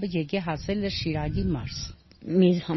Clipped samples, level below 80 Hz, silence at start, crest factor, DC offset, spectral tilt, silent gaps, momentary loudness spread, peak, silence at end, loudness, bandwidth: under 0.1%; -42 dBFS; 0 s; 18 dB; under 0.1%; -6 dB/octave; none; 14 LU; -8 dBFS; 0 s; -27 LUFS; 6.2 kHz